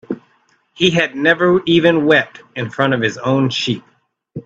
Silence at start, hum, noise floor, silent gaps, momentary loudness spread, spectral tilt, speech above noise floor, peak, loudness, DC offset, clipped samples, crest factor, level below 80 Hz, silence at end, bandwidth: 0.1 s; none; -58 dBFS; none; 14 LU; -5.5 dB/octave; 43 dB; 0 dBFS; -15 LUFS; under 0.1%; under 0.1%; 16 dB; -56 dBFS; 0.05 s; 7.8 kHz